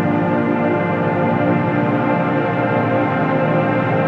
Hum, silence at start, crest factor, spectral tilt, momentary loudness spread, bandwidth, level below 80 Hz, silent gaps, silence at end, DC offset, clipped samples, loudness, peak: none; 0 s; 14 dB; -9.5 dB/octave; 1 LU; 6.4 kHz; -52 dBFS; none; 0 s; under 0.1%; under 0.1%; -17 LUFS; -4 dBFS